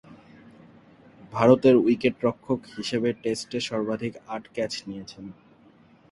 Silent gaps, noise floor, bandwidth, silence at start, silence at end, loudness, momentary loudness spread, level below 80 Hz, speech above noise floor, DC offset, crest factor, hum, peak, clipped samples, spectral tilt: none; -56 dBFS; 11.5 kHz; 0.1 s; 0.8 s; -24 LUFS; 20 LU; -62 dBFS; 31 dB; under 0.1%; 22 dB; none; -4 dBFS; under 0.1%; -6 dB/octave